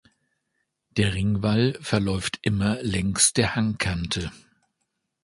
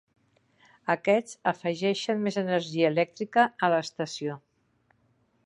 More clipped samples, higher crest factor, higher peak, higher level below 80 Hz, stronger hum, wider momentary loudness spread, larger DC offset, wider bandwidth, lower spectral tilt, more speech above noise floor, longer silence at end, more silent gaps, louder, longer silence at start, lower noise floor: neither; about the same, 20 dB vs 20 dB; about the same, -6 dBFS vs -8 dBFS; first, -44 dBFS vs -78 dBFS; neither; about the same, 9 LU vs 10 LU; neither; about the same, 11.5 kHz vs 11.5 kHz; about the same, -4 dB/octave vs -5 dB/octave; first, 54 dB vs 42 dB; second, 0.85 s vs 1.05 s; neither; first, -24 LUFS vs -27 LUFS; about the same, 0.95 s vs 0.85 s; first, -78 dBFS vs -69 dBFS